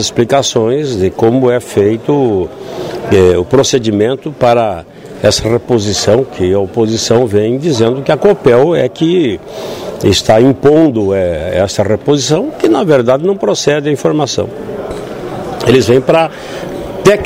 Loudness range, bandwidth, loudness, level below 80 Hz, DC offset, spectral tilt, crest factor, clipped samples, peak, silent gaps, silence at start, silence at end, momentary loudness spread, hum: 2 LU; 16 kHz; -11 LUFS; -38 dBFS; under 0.1%; -5 dB/octave; 10 dB; 0.5%; 0 dBFS; none; 0 s; 0 s; 13 LU; none